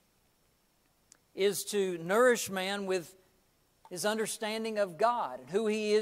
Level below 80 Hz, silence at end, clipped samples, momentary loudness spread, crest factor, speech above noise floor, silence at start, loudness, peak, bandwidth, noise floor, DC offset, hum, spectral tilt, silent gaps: -78 dBFS; 0 s; under 0.1%; 9 LU; 18 dB; 40 dB; 1.35 s; -31 LUFS; -14 dBFS; 16 kHz; -71 dBFS; under 0.1%; none; -3.5 dB/octave; none